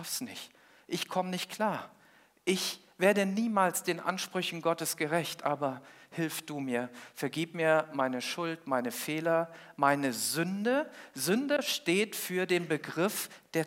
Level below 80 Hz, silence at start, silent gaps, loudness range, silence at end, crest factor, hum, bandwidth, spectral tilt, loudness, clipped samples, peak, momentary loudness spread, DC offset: -86 dBFS; 0 s; none; 3 LU; 0 s; 20 dB; none; 16.5 kHz; -4 dB/octave; -32 LUFS; under 0.1%; -12 dBFS; 9 LU; under 0.1%